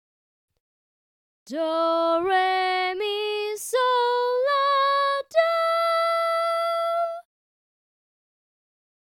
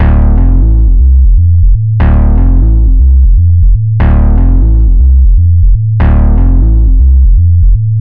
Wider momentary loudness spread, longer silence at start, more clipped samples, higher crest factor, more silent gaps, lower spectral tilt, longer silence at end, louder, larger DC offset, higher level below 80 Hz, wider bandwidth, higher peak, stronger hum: first, 6 LU vs 2 LU; first, 1.45 s vs 0 s; second, under 0.1% vs 3%; first, 16 dB vs 4 dB; neither; second, -1 dB/octave vs -12.5 dB/octave; first, 1.85 s vs 0 s; second, -23 LUFS vs -8 LUFS; neither; second, -74 dBFS vs -6 dBFS; first, 17 kHz vs 2.9 kHz; second, -8 dBFS vs 0 dBFS; neither